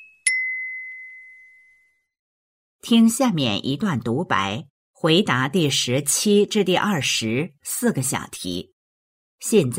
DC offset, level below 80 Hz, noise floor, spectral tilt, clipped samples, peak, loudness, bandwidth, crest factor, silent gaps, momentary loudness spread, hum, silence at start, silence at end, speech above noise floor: under 0.1%; -62 dBFS; -60 dBFS; -4 dB/octave; under 0.1%; -6 dBFS; -21 LUFS; 16 kHz; 18 dB; 2.19-2.79 s, 4.70-4.94 s, 8.73-9.38 s; 13 LU; none; 0 s; 0 s; 40 dB